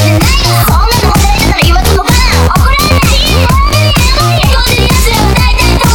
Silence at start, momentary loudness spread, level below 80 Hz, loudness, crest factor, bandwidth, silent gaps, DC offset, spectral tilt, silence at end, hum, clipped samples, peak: 0 s; 1 LU; -10 dBFS; -7 LUFS; 6 dB; over 20 kHz; none; under 0.1%; -4 dB/octave; 0 s; none; 0.2%; 0 dBFS